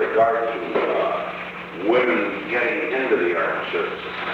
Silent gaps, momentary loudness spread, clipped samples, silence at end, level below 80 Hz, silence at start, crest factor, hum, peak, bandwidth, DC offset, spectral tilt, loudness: none; 8 LU; under 0.1%; 0 s; -60 dBFS; 0 s; 16 dB; none; -6 dBFS; 7.6 kHz; under 0.1%; -6 dB/octave; -22 LUFS